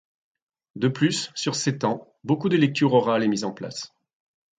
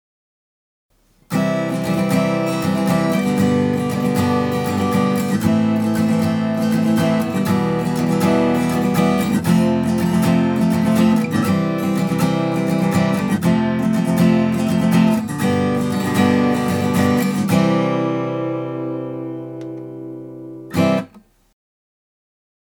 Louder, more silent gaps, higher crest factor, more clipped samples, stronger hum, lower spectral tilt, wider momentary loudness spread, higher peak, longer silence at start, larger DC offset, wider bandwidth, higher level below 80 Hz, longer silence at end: second, -23 LUFS vs -18 LUFS; neither; about the same, 18 dB vs 16 dB; neither; neither; second, -5 dB/octave vs -6.5 dB/octave; first, 13 LU vs 9 LU; second, -8 dBFS vs -2 dBFS; second, 0.75 s vs 1.3 s; neither; second, 9.4 kHz vs 20 kHz; second, -68 dBFS vs -50 dBFS; second, 0.75 s vs 1.65 s